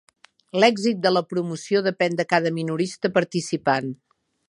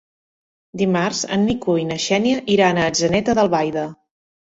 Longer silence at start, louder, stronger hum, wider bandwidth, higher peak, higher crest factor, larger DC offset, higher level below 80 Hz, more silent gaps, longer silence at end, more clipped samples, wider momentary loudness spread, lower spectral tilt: second, 0.55 s vs 0.75 s; second, -22 LUFS vs -18 LUFS; neither; first, 11.5 kHz vs 8 kHz; about the same, -2 dBFS vs -2 dBFS; about the same, 20 dB vs 16 dB; neither; second, -70 dBFS vs -50 dBFS; neither; about the same, 0.55 s vs 0.55 s; neither; about the same, 8 LU vs 7 LU; about the same, -5 dB/octave vs -4.5 dB/octave